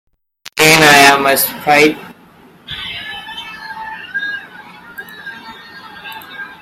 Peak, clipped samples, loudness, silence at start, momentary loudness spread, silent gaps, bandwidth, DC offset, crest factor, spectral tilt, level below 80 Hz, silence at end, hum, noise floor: 0 dBFS; under 0.1%; -10 LUFS; 0.55 s; 25 LU; none; over 20 kHz; under 0.1%; 16 dB; -2.5 dB/octave; -50 dBFS; 0.05 s; none; -44 dBFS